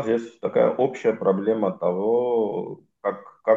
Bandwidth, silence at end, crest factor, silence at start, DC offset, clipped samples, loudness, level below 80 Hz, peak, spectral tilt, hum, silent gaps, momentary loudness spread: 7.6 kHz; 0 s; 16 dB; 0 s; under 0.1%; under 0.1%; -24 LUFS; -74 dBFS; -6 dBFS; -8 dB/octave; none; none; 9 LU